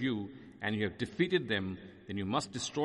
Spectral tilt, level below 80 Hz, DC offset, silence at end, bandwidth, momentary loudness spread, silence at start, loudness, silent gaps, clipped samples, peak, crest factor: -5 dB/octave; -68 dBFS; under 0.1%; 0 s; 11.5 kHz; 11 LU; 0 s; -35 LUFS; none; under 0.1%; -16 dBFS; 18 dB